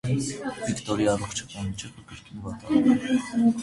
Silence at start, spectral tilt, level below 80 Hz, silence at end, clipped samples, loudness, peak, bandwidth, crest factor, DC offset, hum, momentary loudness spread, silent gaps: 0.05 s; -5.5 dB/octave; -52 dBFS; 0 s; under 0.1%; -26 LUFS; -8 dBFS; 11.5 kHz; 18 dB; under 0.1%; none; 17 LU; none